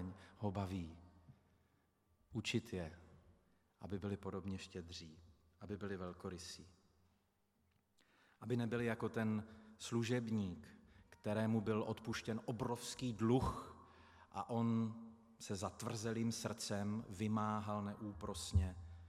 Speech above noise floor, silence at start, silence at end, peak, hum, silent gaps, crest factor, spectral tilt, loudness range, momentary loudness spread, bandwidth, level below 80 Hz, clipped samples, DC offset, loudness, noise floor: 38 dB; 0 s; 0 s; -24 dBFS; none; none; 20 dB; -6 dB/octave; 8 LU; 16 LU; 14.5 kHz; -62 dBFS; under 0.1%; under 0.1%; -43 LUFS; -80 dBFS